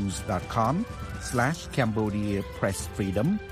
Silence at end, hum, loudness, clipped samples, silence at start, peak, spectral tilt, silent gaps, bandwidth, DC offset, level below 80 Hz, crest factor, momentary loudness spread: 0 s; none; -28 LUFS; under 0.1%; 0 s; -10 dBFS; -6 dB/octave; none; 15.5 kHz; under 0.1%; -44 dBFS; 18 dB; 4 LU